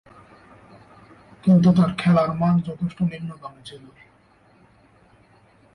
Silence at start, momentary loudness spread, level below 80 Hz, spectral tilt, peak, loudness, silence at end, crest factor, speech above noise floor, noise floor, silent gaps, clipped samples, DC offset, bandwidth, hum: 1.45 s; 23 LU; -56 dBFS; -8.5 dB/octave; -6 dBFS; -20 LUFS; 1.95 s; 18 dB; 36 dB; -56 dBFS; none; under 0.1%; under 0.1%; 10 kHz; none